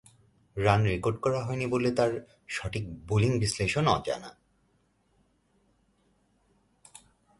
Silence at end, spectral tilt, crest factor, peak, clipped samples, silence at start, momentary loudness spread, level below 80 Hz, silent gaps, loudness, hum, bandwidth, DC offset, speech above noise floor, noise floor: 3.1 s; -5.5 dB/octave; 22 dB; -8 dBFS; under 0.1%; 0.55 s; 12 LU; -52 dBFS; none; -28 LUFS; none; 11.5 kHz; under 0.1%; 42 dB; -70 dBFS